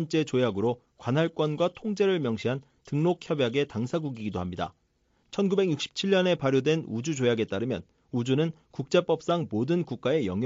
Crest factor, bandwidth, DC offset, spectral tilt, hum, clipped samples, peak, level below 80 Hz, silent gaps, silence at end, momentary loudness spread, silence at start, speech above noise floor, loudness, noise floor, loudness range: 18 dB; 7.8 kHz; under 0.1%; -5.5 dB/octave; none; under 0.1%; -10 dBFS; -64 dBFS; none; 0 s; 9 LU; 0 s; 42 dB; -28 LUFS; -69 dBFS; 2 LU